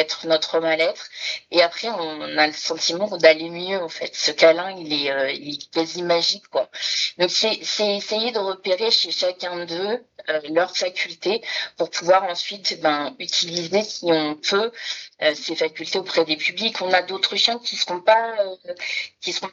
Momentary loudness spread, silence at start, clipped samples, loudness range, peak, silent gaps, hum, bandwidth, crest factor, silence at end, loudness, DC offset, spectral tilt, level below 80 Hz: 9 LU; 0 s; under 0.1%; 3 LU; 0 dBFS; none; none; 7.8 kHz; 22 dB; 0 s; -21 LUFS; under 0.1%; -2 dB/octave; -78 dBFS